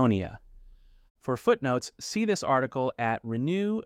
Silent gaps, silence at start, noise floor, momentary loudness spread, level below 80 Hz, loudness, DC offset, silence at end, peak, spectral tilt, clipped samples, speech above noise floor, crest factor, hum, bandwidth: 1.10-1.15 s; 0 s; -53 dBFS; 8 LU; -58 dBFS; -28 LUFS; under 0.1%; 0 s; -10 dBFS; -6 dB/octave; under 0.1%; 26 dB; 18 dB; none; 15.5 kHz